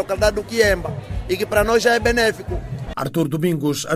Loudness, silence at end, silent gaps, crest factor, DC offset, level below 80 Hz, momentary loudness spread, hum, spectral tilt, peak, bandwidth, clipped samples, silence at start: -20 LUFS; 0 s; none; 16 dB; under 0.1%; -34 dBFS; 12 LU; none; -4.5 dB/octave; -2 dBFS; 16 kHz; under 0.1%; 0 s